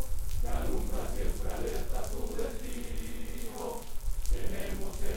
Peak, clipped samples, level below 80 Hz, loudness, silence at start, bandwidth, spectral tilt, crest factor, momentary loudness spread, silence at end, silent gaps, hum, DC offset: -16 dBFS; under 0.1%; -34 dBFS; -38 LUFS; 0 s; 17 kHz; -5 dB/octave; 12 dB; 5 LU; 0 s; none; none; under 0.1%